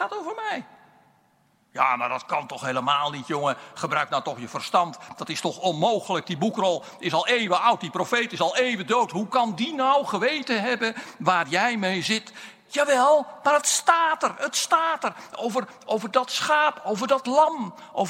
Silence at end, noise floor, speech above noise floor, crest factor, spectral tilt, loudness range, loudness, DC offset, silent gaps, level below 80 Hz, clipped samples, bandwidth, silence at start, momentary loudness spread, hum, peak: 0 s; -64 dBFS; 40 dB; 20 dB; -3 dB/octave; 4 LU; -24 LUFS; under 0.1%; none; -78 dBFS; under 0.1%; 16 kHz; 0 s; 10 LU; none; -4 dBFS